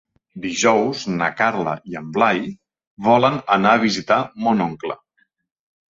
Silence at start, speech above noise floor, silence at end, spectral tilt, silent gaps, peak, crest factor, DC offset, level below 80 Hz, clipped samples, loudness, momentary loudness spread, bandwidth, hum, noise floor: 0.35 s; 47 dB; 1 s; -4.5 dB/octave; 2.87-2.97 s; -2 dBFS; 18 dB; under 0.1%; -60 dBFS; under 0.1%; -19 LUFS; 14 LU; 7.8 kHz; none; -65 dBFS